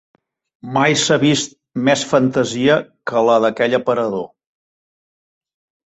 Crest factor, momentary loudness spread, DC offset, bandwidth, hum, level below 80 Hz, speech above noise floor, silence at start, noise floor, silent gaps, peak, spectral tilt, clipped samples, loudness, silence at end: 16 dB; 9 LU; under 0.1%; 8.2 kHz; none; -58 dBFS; over 74 dB; 0.65 s; under -90 dBFS; none; -2 dBFS; -4.5 dB/octave; under 0.1%; -16 LUFS; 1.6 s